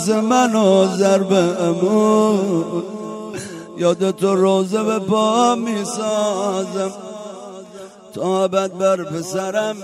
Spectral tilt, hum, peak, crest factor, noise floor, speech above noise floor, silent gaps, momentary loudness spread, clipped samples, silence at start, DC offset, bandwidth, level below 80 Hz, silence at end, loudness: -5.5 dB/octave; none; -2 dBFS; 16 dB; -38 dBFS; 21 dB; none; 17 LU; under 0.1%; 0 s; under 0.1%; 14.5 kHz; -66 dBFS; 0 s; -17 LUFS